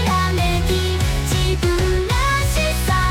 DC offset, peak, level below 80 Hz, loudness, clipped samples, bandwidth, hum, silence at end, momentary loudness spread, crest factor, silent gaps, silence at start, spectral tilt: under 0.1%; -8 dBFS; -22 dBFS; -19 LUFS; under 0.1%; 17.5 kHz; none; 0 s; 2 LU; 10 dB; none; 0 s; -4.5 dB/octave